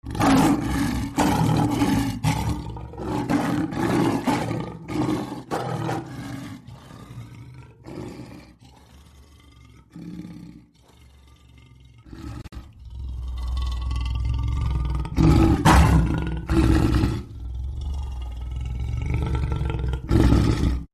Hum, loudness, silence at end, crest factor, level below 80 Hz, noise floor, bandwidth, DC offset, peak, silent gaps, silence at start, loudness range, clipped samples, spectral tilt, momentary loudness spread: none; -23 LUFS; 0.05 s; 18 dB; -30 dBFS; -52 dBFS; 13.5 kHz; under 0.1%; -6 dBFS; none; 0.05 s; 22 LU; under 0.1%; -6.5 dB/octave; 22 LU